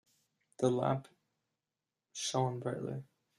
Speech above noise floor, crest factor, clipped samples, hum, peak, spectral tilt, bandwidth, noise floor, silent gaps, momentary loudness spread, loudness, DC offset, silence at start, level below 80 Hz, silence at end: over 55 dB; 22 dB; under 0.1%; none; -16 dBFS; -5.5 dB/octave; 12 kHz; under -90 dBFS; none; 11 LU; -36 LUFS; under 0.1%; 0.6 s; -74 dBFS; 0.35 s